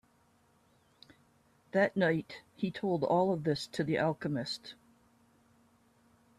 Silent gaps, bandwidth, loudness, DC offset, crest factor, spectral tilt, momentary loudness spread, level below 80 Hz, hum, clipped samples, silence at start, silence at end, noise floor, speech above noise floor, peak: none; 13 kHz; -33 LUFS; under 0.1%; 20 dB; -6.5 dB/octave; 10 LU; -72 dBFS; none; under 0.1%; 1.75 s; 1.65 s; -69 dBFS; 37 dB; -14 dBFS